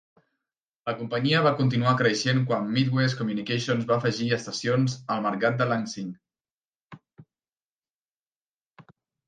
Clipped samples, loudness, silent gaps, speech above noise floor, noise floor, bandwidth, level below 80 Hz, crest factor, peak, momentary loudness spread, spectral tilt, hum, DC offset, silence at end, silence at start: under 0.1%; -25 LUFS; 6.51-6.56 s, 6.75-6.80 s, 6.86-6.90 s, 7.62-7.76 s, 7.95-8.05 s, 8.14-8.74 s; over 65 dB; under -90 dBFS; 9.4 kHz; -68 dBFS; 20 dB; -8 dBFS; 9 LU; -5.5 dB/octave; none; under 0.1%; 0.45 s; 0.85 s